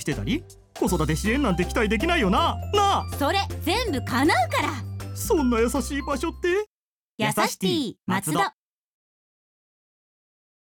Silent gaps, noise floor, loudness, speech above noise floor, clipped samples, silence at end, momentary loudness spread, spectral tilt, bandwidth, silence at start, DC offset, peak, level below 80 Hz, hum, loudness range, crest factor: 6.67-7.18 s; under -90 dBFS; -24 LUFS; over 67 dB; under 0.1%; 2.25 s; 7 LU; -4.5 dB/octave; 19 kHz; 0 s; under 0.1%; -8 dBFS; -38 dBFS; none; 5 LU; 18 dB